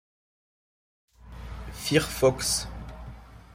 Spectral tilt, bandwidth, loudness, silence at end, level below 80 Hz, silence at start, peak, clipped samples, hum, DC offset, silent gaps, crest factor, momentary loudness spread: -3.5 dB/octave; 16 kHz; -25 LUFS; 0 s; -44 dBFS; 1.2 s; -8 dBFS; under 0.1%; none; under 0.1%; none; 22 dB; 22 LU